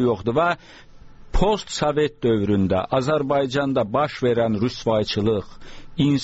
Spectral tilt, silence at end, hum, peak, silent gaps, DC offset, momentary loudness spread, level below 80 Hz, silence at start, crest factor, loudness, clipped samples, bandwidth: -5.5 dB/octave; 0 s; none; -6 dBFS; none; under 0.1%; 3 LU; -36 dBFS; 0 s; 14 dB; -22 LUFS; under 0.1%; 8 kHz